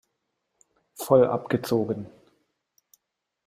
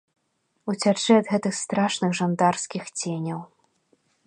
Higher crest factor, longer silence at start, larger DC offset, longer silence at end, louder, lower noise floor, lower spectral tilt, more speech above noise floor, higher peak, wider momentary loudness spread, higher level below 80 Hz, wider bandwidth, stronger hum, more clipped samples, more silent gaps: about the same, 22 dB vs 20 dB; first, 1 s vs 0.65 s; neither; first, 1.4 s vs 0.8 s; about the same, -24 LUFS vs -24 LUFS; first, -80 dBFS vs -73 dBFS; first, -6.5 dB/octave vs -4.5 dB/octave; first, 57 dB vs 49 dB; about the same, -6 dBFS vs -6 dBFS; first, 17 LU vs 12 LU; first, -66 dBFS vs -72 dBFS; first, 15.5 kHz vs 10.5 kHz; neither; neither; neither